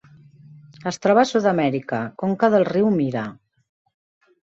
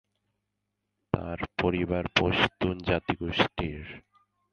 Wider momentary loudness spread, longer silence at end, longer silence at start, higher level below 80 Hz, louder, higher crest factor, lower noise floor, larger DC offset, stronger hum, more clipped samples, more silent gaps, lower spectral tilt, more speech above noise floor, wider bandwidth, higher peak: about the same, 12 LU vs 10 LU; first, 1.15 s vs 0.55 s; second, 0.85 s vs 1.15 s; second, -64 dBFS vs -46 dBFS; first, -20 LUFS vs -28 LUFS; second, 18 dB vs 24 dB; second, -48 dBFS vs -82 dBFS; neither; neither; neither; neither; about the same, -6.5 dB/octave vs -6 dB/octave; second, 29 dB vs 54 dB; about the same, 8 kHz vs 8.8 kHz; about the same, -4 dBFS vs -6 dBFS